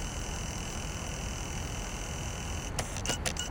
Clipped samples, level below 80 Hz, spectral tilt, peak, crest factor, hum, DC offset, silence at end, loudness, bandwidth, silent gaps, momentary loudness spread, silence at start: under 0.1%; -40 dBFS; -3 dB/octave; -14 dBFS; 22 dB; none; under 0.1%; 0 s; -36 LUFS; 19 kHz; none; 5 LU; 0 s